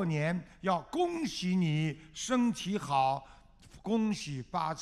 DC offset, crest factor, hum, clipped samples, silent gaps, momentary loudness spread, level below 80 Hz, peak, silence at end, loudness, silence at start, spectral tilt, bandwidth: under 0.1%; 16 dB; none; under 0.1%; none; 7 LU; -60 dBFS; -16 dBFS; 0 s; -32 LUFS; 0 s; -5.5 dB/octave; 13 kHz